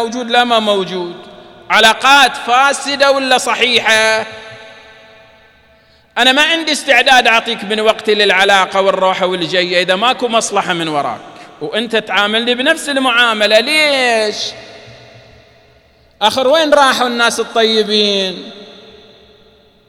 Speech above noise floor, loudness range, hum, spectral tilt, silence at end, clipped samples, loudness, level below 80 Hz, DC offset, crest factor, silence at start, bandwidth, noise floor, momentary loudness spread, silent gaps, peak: 36 dB; 4 LU; none; -2 dB/octave; 1.15 s; 0.1%; -11 LUFS; -54 dBFS; under 0.1%; 14 dB; 0 s; 19 kHz; -48 dBFS; 12 LU; none; 0 dBFS